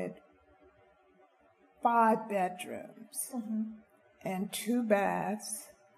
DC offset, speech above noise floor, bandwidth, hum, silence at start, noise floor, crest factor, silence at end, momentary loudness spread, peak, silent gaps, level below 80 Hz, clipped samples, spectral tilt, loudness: under 0.1%; 34 dB; 15 kHz; none; 0 s; -66 dBFS; 20 dB; 0.25 s; 15 LU; -14 dBFS; none; -76 dBFS; under 0.1%; -4.5 dB/octave; -33 LUFS